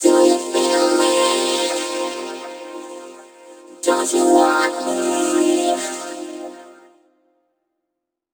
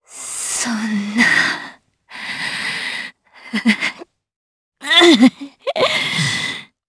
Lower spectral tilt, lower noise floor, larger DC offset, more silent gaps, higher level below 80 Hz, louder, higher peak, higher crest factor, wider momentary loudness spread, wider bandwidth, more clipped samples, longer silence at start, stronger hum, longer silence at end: second, -1.5 dB/octave vs -3 dB/octave; first, -79 dBFS vs -40 dBFS; neither; second, none vs 4.36-4.72 s; second, -84 dBFS vs -60 dBFS; about the same, -18 LUFS vs -16 LUFS; about the same, 0 dBFS vs 0 dBFS; about the same, 18 dB vs 18 dB; about the same, 19 LU vs 17 LU; first, over 20 kHz vs 11 kHz; neither; about the same, 0 s vs 0.1 s; neither; first, 1.6 s vs 0.25 s